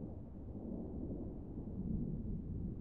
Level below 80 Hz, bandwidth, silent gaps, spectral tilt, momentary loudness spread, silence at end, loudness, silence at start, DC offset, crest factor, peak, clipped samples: -50 dBFS; 2.2 kHz; none; -13.5 dB/octave; 7 LU; 0 s; -45 LUFS; 0 s; 0.1%; 14 dB; -30 dBFS; under 0.1%